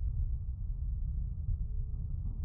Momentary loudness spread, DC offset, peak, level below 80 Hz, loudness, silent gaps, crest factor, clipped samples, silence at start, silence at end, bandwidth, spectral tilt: 2 LU; under 0.1%; -24 dBFS; -36 dBFS; -39 LUFS; none; 10 dB; under 0.1%; 0 s; 0 s; 1.3 kHz; -13.5 dB/octave